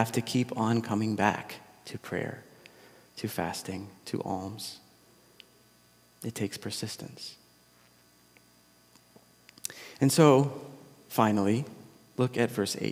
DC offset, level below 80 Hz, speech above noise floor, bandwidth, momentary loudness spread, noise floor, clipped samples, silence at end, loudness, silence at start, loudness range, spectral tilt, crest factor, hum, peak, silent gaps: under 0.1%; -72 dBFS; 33 dB; 16.5 kHz; 19 LU; -62 dBFS; under 0.1%; 0 s; -29 LUFS; 0 s; 13 LU; -5.5 dB/octave; 24 dB; none; -6 dBFS; none